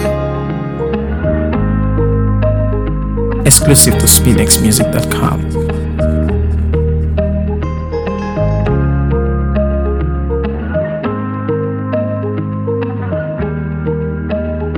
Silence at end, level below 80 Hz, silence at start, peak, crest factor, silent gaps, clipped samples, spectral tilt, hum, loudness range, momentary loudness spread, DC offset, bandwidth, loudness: 0 s; -20 dBFS; 0 s; 0 dBFS; 14 dB; none; 0.3%; -5 dB/octave; none; 8 LU; 11 LU; under 0.1%; over 20 kHz; -14 LUFS